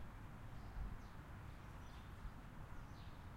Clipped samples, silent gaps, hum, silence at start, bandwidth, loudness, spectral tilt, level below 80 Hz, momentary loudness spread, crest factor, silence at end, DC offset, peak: under 0.1%; none; none; 0 s; 16 kHz; -56 LUFS; -6.5 dB/octave; -56 dBFS; 4 LU; 16 dB; 0 s; under 0.1%; -36 dBFS